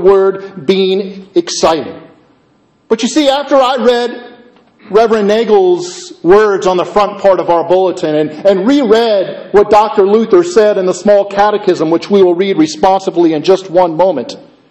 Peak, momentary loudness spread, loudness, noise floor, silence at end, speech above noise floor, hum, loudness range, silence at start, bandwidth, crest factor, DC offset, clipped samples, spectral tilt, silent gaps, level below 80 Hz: 0 dBFS; 8 LU; -10 LUFS; -51 dBFS; 0.3 s; 41 dB; none; 4 LU; 0 s; 8.6 kHz; 10 dB; under 0.1%; 0.3%; -5 dB/octave; none; -46 dBFS